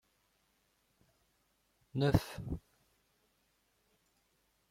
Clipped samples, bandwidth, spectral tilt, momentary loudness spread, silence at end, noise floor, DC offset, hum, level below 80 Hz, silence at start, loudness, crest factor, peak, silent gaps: under 0.1%; 16.5 kHz; -7 dB/octave; 13 LU; 2.1 s; -77 dBFS; under 0.1%; none; -56 dBFS; 1.95 s; -36 LUFS; 28 dB; -12 dBFS; none